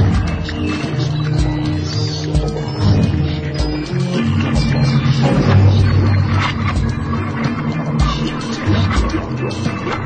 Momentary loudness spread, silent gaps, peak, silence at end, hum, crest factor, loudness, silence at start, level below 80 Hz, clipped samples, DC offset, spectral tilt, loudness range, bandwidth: 7 LU; none; -2 dBFS; 0 s; none; 14 dB; -17 LUFS; 0 s; -26 dBFS; under 0.1%; under 0.1%; -7 dB/octave; 3 LU; 9 kHz